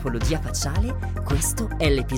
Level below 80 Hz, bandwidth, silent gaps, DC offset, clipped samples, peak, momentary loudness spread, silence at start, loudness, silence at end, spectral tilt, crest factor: -28 dBFS; 17 kHz; none; under 0.1%; under 0.1%; -8 dBFS; 4 LU; 0 s; -24 LUFS; 0 s; -4.5 dB/octave; 14 dB